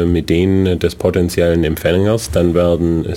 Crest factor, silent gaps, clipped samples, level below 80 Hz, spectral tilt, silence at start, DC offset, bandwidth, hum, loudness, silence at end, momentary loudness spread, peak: 12 dB; none; under 0.1%; -30 dBFS; -6.5 dB/octave; 0 s; under 0.1%; 16.5 kHz; none; -15 LUFS; 0 s; 2 LU; -2 dBFS